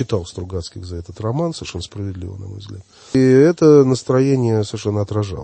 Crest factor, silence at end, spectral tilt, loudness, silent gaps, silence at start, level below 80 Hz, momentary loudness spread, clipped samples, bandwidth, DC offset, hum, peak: 16 dB; 0 s; -7 dB/octave; -17 LUFS; none; 0 s; -46 dBFS; 20 LU; under 0.1%; 8.8 kHz; under 0.1%; none; -2 dBFS